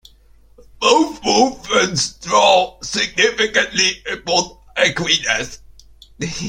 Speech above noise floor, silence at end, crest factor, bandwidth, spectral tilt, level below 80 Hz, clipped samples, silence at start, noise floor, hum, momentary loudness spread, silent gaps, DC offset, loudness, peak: 31 dB; 0 s; 18 dB; 16 kHz; -2 dB/octave; -48 dBFS; under 0.1%; 0.8 s; -48 dBFS; none; 8 LU; none; under 0.1%; -16 LUFS; 0 dBFS